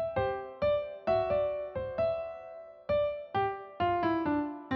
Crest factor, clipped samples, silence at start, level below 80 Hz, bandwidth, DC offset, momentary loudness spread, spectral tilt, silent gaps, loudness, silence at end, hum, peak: 14 dB; under 0.1%; 0 s; -56 dBFS; 5.8 kHz; under 0.1%; 8 LU; -5 dB/octave; none; -32 LUFS; 0 s; none; -18 dBFS